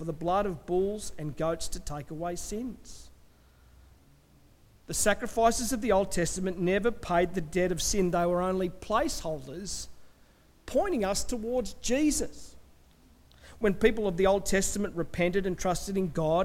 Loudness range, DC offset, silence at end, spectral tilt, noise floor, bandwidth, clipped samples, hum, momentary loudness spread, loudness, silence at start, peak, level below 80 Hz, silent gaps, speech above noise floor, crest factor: 8 LU; under 0.1%; 0 s; -4.5 dB/octave; -59 dBFS; 16.5 kHz; under 0.1%; none; 11 LU; -29 LUFS; 0 s; -10 dBFS; -44 dBFS; none; 31 dB; 20 dB